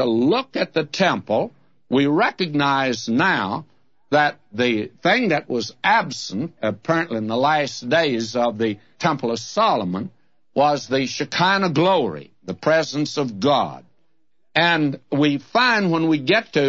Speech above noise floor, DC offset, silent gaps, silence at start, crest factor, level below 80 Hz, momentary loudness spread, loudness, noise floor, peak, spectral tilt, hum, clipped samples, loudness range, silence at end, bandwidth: 53 dB; 0.2%; none; 0 s; 18 dB; -66 dBFS; 8 LU; -20 LUFS; -73 dBFS; -4 dBFS; -5 dB/octave; none; under 0.1%; 1 LU; 0 s; 7.8 kHz